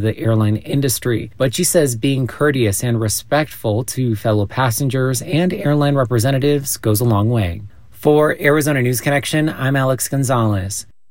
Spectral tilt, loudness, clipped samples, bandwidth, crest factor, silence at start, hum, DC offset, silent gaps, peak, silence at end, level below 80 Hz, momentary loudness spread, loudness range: -5.5 dB/octave; -17 LUFS; under 0.1%; 16.5 kHz; 16 dB; 0 s; none; 1%; none; -2 dBFS; 0.3 s; -46 dBFS; 5 LU; 2 LU